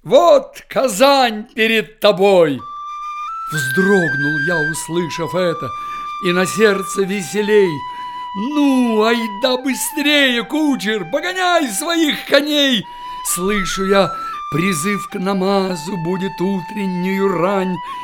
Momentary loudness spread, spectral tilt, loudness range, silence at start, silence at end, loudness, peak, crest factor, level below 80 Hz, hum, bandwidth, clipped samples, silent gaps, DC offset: 12 LU; -4 dB/octave; 3 LU; 0.05 s; 0 s; -16 LUFS; 0 dBFS; 16 dB; -46 dBFS; none; 17.5 kHz; under 0.1%; none; under 0.1%